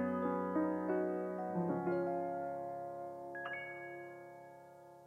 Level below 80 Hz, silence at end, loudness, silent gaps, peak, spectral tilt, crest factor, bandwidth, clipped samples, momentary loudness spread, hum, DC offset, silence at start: -82 dBFS; 0 s; -39 LUFS; none; -24 dBFS; -9 dB/octave; 16 dB; 12.5 kHz; under 0.1%; 17 LU; none; under 0.1%; 0 s